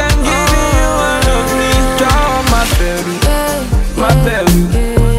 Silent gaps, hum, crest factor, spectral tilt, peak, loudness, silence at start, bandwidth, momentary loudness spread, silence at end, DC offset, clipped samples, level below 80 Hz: none; none; 10 dB; -4.5 dB/octave; 0 dBFS; -12 LUFS; 0 s; 16.5 kHz; 4 LU; 0 s; under 0.1%; under 0.1%; -16 dBFS